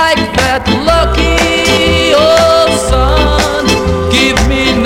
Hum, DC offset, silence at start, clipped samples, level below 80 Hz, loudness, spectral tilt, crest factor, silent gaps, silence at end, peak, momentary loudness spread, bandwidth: none; under 0.1%; 0 s; under 0.1%; -18 dBFS; -9 LUFS; -4 dB/octave; 10 dB; none; 0 s; 0 dBFS; 4 LU; 16.5 kHz